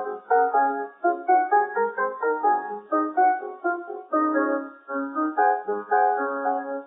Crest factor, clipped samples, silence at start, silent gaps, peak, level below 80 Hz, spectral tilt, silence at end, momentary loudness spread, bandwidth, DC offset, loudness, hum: 16 dB; under 0.1%; 0 s; none; -8 dBFS; under -90 dBFS; -10 dB/octave; 0 s; 7 LU; 2.5 kHz; under 0.1%; -24 LUFS; none